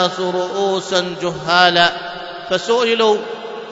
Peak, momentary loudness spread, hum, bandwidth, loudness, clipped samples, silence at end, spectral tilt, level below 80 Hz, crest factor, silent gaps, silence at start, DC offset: 0 dBFS; 15 LU; none; 8 kHz; -16 LUFS; under 0.1%; 0 s; -3.5 dB/octave; -58 dBFS; 18 dB; none; 0 s; under 0.1%